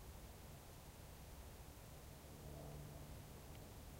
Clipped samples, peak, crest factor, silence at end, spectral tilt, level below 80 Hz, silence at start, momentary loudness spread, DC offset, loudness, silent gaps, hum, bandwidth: under 0.1%; -42 dBFS; 14 dB; 0 s; -5 dB/octave; -62 dBFS; 0 s; 4 LU; under 0.1%; -57 LUFS; none; none; 16 kHz